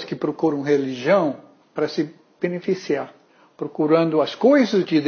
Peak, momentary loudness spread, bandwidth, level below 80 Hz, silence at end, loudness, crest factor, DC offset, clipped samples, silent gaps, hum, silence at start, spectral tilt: -4 dBFS; 14 LU; 6.8 kHz; -72 dBFS; 0 s; -21 LUFS; 18 dB; under 0.1%; under 0.1%; none; none; 0 s; -6.5 dB/octave